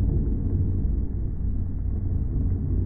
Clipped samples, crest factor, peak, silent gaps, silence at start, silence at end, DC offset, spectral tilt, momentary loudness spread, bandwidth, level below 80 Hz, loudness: under 0.1%; 10 dB; -14 dBFS; none; 0 s; 0 s; under 0.1%; -15 dB/octave; 4 LU; 2 kHz; -26 dBFS; -28 LUFS